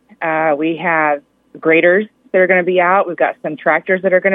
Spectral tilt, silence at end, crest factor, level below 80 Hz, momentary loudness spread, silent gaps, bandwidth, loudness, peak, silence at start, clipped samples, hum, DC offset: -9 dB/octave; 0 s; 14 dB; -72 dBFS; 7 LU; none; 3.9 kHz; -14 LUFS; 0 dBFS; 0.2 s; under 0.1%; none; under 0.1%